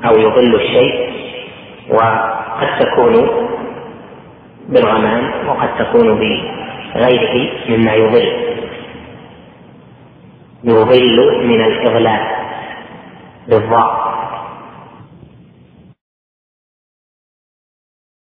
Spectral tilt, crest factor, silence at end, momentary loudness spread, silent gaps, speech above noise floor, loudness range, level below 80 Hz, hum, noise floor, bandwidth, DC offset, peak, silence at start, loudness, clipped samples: -9.5 dB/octave; 14 dB; 3.35 s; 19 LU; none; 32 dB; 6 LU; -48 dBFS; none; -43 dBFS; 4.8 kHz; under 0.1%; 0 dBFS; 0 s; -13 LUFS; under 0.1%